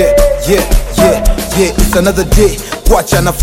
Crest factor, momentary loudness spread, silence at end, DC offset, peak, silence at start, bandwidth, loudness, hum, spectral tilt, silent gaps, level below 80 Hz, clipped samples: 8 dB; 4 LU; 0 s; under 0.1%; 0 dBFS; 0 s; 17 kHz; -11 LUFS; none; -4.5 dB/octave; none; -14 dBFS; under 0.1%